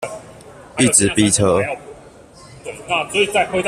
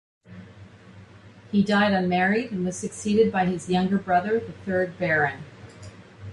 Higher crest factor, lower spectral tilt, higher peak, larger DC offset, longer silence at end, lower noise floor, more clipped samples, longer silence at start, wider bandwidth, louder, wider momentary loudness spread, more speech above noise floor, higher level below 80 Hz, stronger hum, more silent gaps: about the same, 18 dB vs 16 dB; second, -3 dB/octave vs -6 dB/octave; first, 0 dBFS vs -8 dBFS; neither; about the same, 0 s vs 0 s; second, -42 dBFS vs -48 dBFS; neither; second, 0 s vs 0.3 s; first, 15 kHz vs 11.5 kHz; first, -16 LUFS vs -24 LUFS; second, 20 LU vs 23 LU; about the same, 26 dB vs 25 dB; first, -48 dBFS vs -56 dBFS; neither; neither